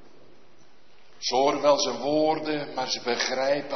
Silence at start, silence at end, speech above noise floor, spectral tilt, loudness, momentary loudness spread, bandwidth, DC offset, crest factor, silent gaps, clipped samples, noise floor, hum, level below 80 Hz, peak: 1.2 s; 0 s; 34 dB; -3 dB/octave; -25 LUFS; 7 LU; 6.4 kHz; 0.7%; 18 dB; none; under 0.1%; -59 dBFS; none; -68 dBFS; -8 dBFS